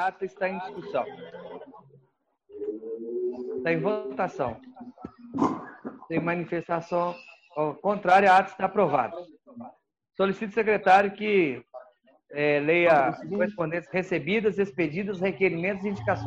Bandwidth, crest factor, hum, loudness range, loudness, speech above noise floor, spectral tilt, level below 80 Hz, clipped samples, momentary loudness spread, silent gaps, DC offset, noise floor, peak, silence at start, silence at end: 8.6 kHz; 20 dB; none; 8 LU; -26 LUFS; 44 dB; -7 dB/octave; -64 dBFS; under 0.1%; 22 LU; none; under 0.1%; -69 dBFS; -8 dBFS; 0 s; 0 s